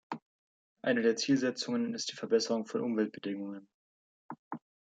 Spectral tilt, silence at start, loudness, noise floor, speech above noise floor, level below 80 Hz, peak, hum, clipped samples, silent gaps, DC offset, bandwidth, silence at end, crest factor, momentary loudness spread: -4 dB/octave; 0.1 s; -32 LUFS; under -90 dBFS; over 58 dB; -84 dBFS; -16 dBFS; none; under 0.1%; 0.22-0.76 s, 3.74-4.29 s, 4.39-4.51 s; under 0.1%; 9.2 kHz; 0.35 s; 18 dB; 18 LU